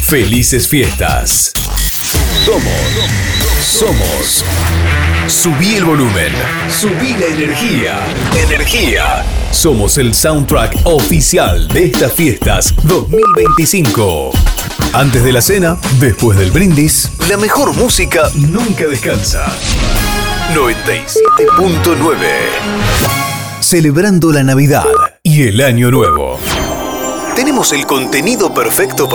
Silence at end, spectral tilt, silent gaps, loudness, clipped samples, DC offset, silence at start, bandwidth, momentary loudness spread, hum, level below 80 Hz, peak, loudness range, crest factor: 0 s; -4 dB/octave; none; -10 LUFS; under 0.1%; under 0.1%; 0 s; over 20 kHz; 5 LU; none; -20 dBFS; -2 dBFS; 2 LU; 10 dB